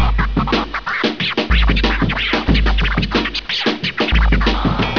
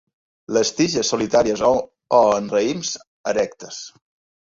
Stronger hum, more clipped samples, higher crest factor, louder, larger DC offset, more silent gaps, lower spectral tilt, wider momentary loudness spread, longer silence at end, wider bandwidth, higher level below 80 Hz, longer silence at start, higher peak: neither; neither; about the same, 14 dB vs 18 dB; first, -17 LUFS vs -20 LUFS; first, 0.7% vs under 0.1%; second, none vs 3.07-3.24 s; first, -6 dB/octave vs -3.5 dB/octave; second, 4 LU vs 14 LU; second, 0 s vs 0.5 s; second, 5.4 kHz vs 7.8 kHz; first, -20 dBFS vs -54 dBFS; second, 0 s vs 0.5 s; about the same, -2 dBFS vs -2 dBFS